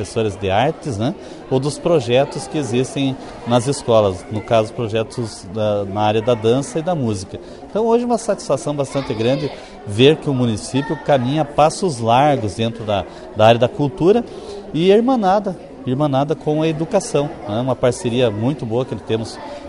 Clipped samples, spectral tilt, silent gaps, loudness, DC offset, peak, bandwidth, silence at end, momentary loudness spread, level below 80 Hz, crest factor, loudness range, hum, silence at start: under 0.1%; -6 dB/octave; none; -18 LUFS; under 0.1%; 0 dBFS; 11 kHz; 0 s; 11 LU; -46 dBFS; 18 dB; 3 LU; none; 0 s